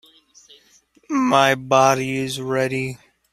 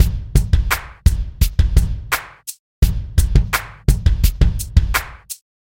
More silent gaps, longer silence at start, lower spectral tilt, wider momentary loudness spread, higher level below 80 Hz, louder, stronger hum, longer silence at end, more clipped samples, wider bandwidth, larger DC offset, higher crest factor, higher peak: second, none vs 2.59-2.82 s; first, 1.1 s vs 0 s; about the same, -4.5 dB/octave vs -4.5 dB/octave; about the same, 10 LU vs 12 LU; second, -60 dBFS vs -18 dBFS; about the same, -19 LUFS vs -19 LUFS; neither; about the same, 0.35 s vs 0.3 s; neither; about the same, 16 kHz vs 17 kHz; neither; about the same, 20 dB vs 16 dB; about the same, -2 dBFS vs 0 dBFS